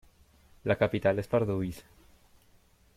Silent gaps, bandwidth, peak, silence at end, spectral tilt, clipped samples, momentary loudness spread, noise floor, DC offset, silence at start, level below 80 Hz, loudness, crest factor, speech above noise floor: none; 15.5 kHz; -12 dBFS; 1.15 s; -7.5 dB/octave; under 0.1%; 12 LU; -63 dBFS; under 0.1%; 0.65 s; -58 dBFS; -30 LUFS; 20 dB; 34 dB